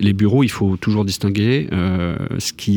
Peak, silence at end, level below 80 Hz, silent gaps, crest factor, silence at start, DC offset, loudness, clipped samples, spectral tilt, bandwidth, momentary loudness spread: -4 dBFS; 0 s; -42 dBFS; none; 14 dB; 0 s; under 0.1%; -18 LUFS; under 0.1%; -6 dB/octave; over 20 kHz; 7 LU